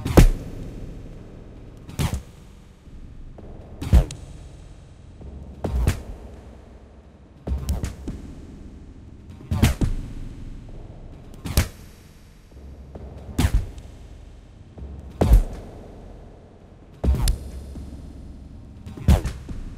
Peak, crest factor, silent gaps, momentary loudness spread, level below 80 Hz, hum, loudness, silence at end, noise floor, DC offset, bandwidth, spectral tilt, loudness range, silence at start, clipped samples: 0 dBFS; 24 dB; none; 25 LU; -28 dBFS; none; -25 LUFS; 0 s; -47 dBFS; under 0.1%; 16 kHz; -6 dB/octave; 6 LU; 0 s; under 0.1%